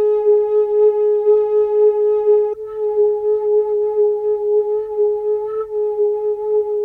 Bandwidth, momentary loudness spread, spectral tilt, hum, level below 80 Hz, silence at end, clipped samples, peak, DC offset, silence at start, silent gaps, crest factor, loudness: 2.7 kHz; 6 LU; -8 dB/octave; none; -58 dBFS; 0 s; under 0.1%; -6 dBFS; under 0.1%; 0 s; none; 10 dB; -17 LUFS